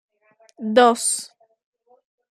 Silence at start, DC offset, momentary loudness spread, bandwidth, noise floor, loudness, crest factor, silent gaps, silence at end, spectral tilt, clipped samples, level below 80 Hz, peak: 0.6 s; under 0.1%; 18 LU; 14 kHz; -58 dBFS; -18 LUFS; 22 dB; none; 1.05 s; -2 dB/octave; under 0.1%; -74 dBFS; -2 dBFS